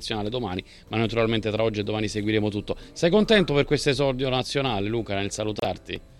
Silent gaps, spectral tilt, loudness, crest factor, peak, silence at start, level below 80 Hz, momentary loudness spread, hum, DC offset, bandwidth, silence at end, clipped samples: none; -5.5 dB/octave; -25 LUFS; 20 dB; -6 dBFS; 0 s; -44 dBFS; 11 LU; none; under 0.1%; 13 kHz; 0.05 s; under 0.1%